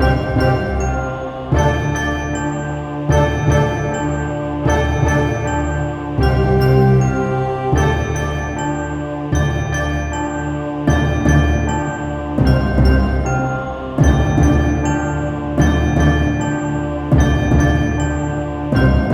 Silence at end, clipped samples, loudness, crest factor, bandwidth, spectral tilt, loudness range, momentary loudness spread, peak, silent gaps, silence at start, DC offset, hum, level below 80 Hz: 0 s; under 0.1%; -17 LUFS; 14 dB; 10.5 kHz; -7 dB/octave; 2 LU; 7 LU; -2 dBFS; none; 0 s; under 0.1%; none; -22 dBFS